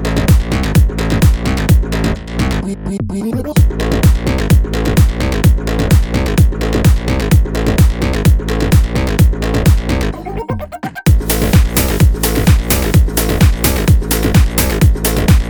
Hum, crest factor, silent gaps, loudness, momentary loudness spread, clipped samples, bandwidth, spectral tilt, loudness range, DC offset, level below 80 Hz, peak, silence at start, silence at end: none; 12 dB; none; -13 LUFS; 6 LU; under 0.1%; over 20 kHz; -6 dB/octave; 2 LU; under 0.1%; -16 dBFS; 0 dBFS; 0 s; 0 s